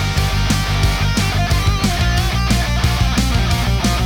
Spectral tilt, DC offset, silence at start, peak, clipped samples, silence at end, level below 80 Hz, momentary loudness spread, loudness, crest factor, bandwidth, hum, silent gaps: -4.5 dB/octave; under 0.1%; 0 s; -2 dBFS; under 0.1%; 0 s; -20 dBFS; 1 LU; -17 LUFS; 14 dB; 19.5 kHz; none; none